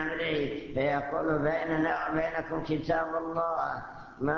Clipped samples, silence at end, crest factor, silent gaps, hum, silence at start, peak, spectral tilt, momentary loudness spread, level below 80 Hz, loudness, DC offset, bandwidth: under 0.1%; 0 s; 16 dB; none; none; 0 s; -14 dBFS; -4.5 dB/octave; 5 LU; -54 dBFS; -30 LUFS; under 0.1%; 6.8 kHz